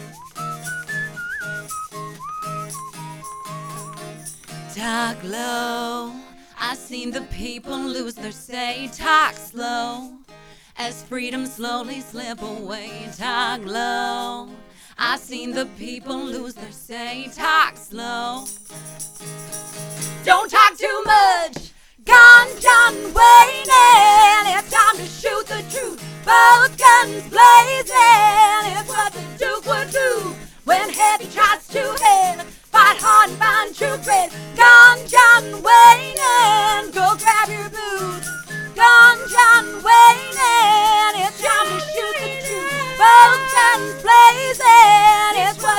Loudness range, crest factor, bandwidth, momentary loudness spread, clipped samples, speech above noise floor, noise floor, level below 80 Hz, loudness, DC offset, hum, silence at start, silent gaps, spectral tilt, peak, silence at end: 18 LU; 16 dB; 19.5 kHz; 23 LU; under 0.1%; 32 dB; -46 dBFS; -46 dBFS; -12 LUFS; under 0.1%; none; 0 s; none; -1.5 dB/octave; 0 dBFS; 0 s